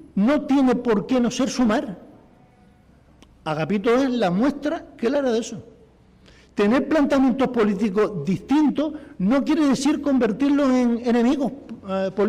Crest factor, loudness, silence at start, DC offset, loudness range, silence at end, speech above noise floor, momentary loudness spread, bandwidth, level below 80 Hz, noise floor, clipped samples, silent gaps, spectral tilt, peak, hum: 8 dB; -21 LUFS; 0 s; under 0.1%; 4 LU; 0 s; 33 dB; 9 LU; 11 kHz; -52 dBFS; -53 dBFS; under 0.1%; none; -6 dB/octave; -12 dBFS; none